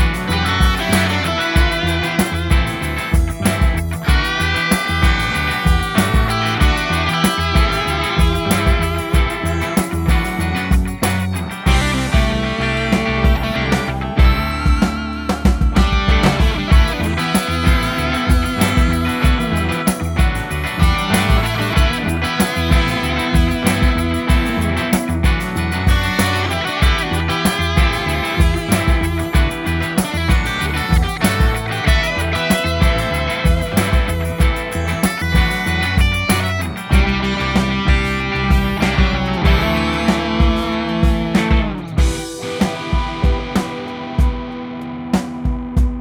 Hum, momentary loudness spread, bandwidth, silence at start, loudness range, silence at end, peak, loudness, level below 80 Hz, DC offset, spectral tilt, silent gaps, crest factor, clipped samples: none; 4 LU; 19 kHz; 0 s; 2 LU; 0 s; 0 dBFS; -17 LUFS; -20 dBFS; under 0.1%; -5 dB/octave; none; 14 dB; under 0.1%